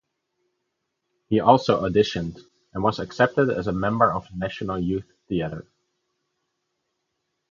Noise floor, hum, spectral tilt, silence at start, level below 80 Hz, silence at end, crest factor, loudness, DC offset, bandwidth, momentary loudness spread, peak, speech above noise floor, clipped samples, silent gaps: -78 dBFS; none; -7 dB/octave; 1.3 s; -50 dBFS; 1.9 s; 24 dB; -23 LUFS; under 0.1%; 7.4 kHz; 13 LU; -2 dBFS; 56 dB; under 0.1%; none